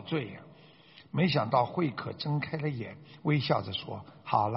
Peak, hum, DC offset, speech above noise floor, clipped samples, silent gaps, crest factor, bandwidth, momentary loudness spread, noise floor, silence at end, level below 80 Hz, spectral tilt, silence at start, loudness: -10 dBFS; none; under 0.1%; 25 dB; under 0.1%; none; 20 dB; 5.8 kHz; 15 LU; -56 dBFS; 0 s; -66 dBFS; -5 dB/octave; 0 s; -31 LUFS